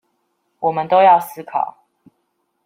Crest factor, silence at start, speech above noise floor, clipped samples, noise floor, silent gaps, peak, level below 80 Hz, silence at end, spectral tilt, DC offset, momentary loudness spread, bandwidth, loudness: 16 dB; 0.6 s; 54 dB; under 0.1%; -69 dBFS; none; -2 dBFS; -70 dBFS; 0.95 s; -5 dB/octave; under 0.1%; 13 LU; 16.5 kHz; -16 LUFS